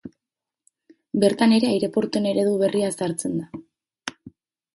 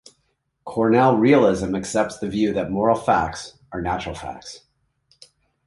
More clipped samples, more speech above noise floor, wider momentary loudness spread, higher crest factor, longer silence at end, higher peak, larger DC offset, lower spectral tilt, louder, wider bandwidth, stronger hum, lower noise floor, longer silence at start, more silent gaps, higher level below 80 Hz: neither; first, 67 dB vs 51 dB; about the same, 18 LU vs 18 LU; about the same, 18 dB vs 18 dB; second, 0.45 s vs 1.1 s; about the same, -6 dBFS vs -4 dBFS; neither; about the same, -5.5 dB/octave vs -6 dB/octave; about the same, -22 LUFS vs -20 LUFS; about the same, 11.5 kHz vs 11.5 kHz; neither; first, -88 dBFS vs -71 dBFS; second, 0.05 s vs 0.65 s; neither; second, -64 dBFS vs -46 dBFS